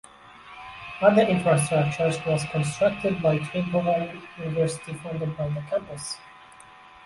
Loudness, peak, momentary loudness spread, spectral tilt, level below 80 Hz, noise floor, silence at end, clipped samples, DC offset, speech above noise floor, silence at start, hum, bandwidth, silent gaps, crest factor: -25 LUFS; -4 dBFS; 15 LU; -6 dB/octave; -56 dBFS; -49 dBFS; 0.15 s; under 0.1%; under 0.1%; 25 dB; 0.25 s; none; 11.5 kHz; none; 20 dB